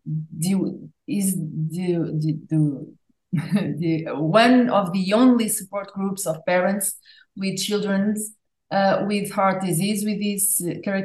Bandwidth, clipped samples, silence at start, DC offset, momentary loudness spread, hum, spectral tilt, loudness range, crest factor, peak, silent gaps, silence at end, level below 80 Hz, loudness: 13 kHz; under 0.1%; 0.05 s; under 0.1%; 12 LU; none; -5 dB/octave; 5 LU; 20 dB; -2 dBFS; none; 0 s; -70 dBFS; -22 LUFS